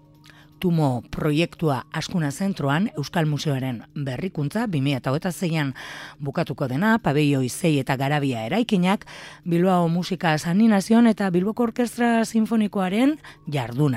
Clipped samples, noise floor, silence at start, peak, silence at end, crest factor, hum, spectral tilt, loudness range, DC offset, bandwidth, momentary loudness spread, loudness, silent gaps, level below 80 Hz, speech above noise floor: under 0.1%; -50 dBFS; 0.6 s; -6 dBFS; 0 s; 16 dB; none; -6.5 dB/octave; 5 LU; under 0.1%; 16 kHz; 9 LU; -23 LUFS; none; -54 dBFS; 28 dB